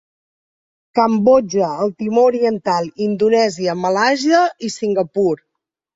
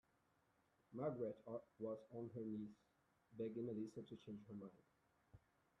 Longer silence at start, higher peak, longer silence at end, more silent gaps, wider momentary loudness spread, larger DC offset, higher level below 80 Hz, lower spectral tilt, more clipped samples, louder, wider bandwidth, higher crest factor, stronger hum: about the same, 0.95 s vs 0.9 s; first, -2 dBFS vs -34 dBFS; first, 0.6 s vs 0.4 s; neither; second, 7 LU vs 10 LU; neither; first, -60 dBFS vs -86 dBFS; second, -5 dB/octave vs -9 dB/octave; neither; first, -16 LUFS vs -51 LUFS; about the same, 7.8 kHz vs 7.2 kHz; about the same, 16 dB vs 18 dB; neither